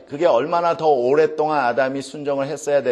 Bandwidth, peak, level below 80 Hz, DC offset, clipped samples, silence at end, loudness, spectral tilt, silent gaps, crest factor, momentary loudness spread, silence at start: 12 kHz; -4 dBFS; -68 dBFS; under 0.1%; under 0.1%; 0 s; -19 LUFS; -5 dB/octave; none; 14 dB; 7 LU; 0.1 s